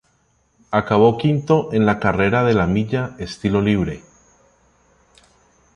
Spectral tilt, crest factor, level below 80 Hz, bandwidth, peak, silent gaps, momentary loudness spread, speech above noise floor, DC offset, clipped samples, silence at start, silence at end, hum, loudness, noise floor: -7.5 dB/octave; 18 dB; -42 dBFS; 10 kHz; -2 dBFS; none; 9 LU; 45 dB; under 0.1%; under 0.1%; 0.7 s; 1.75 s; none; -18 LUFS; -62 dBFS